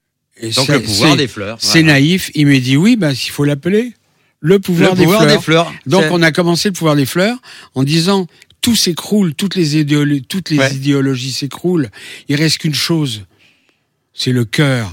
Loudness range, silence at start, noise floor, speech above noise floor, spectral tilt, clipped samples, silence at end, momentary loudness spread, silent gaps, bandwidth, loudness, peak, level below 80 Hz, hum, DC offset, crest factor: 5 LU; 0.4 s; -60 dBFS; 48 dB; -5 dB/octave; under 0.1%; 0 s; 9 LU; none; 17 kHz; -13 LUFS; 0 dBFS; -52 dBFS; none; under 0.1%; 14 dB